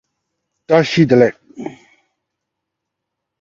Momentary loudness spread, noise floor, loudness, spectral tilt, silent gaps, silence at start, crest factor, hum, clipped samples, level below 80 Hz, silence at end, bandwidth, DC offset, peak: 20 LU; -79 dBFS; -13 LUFS; -7 dB/octave; none; 0.7 s; 18 dB; none; under 0.1%; -58 dBFS; 1.7 s; 7.6 kHz; under 0.1%; 0 dBFS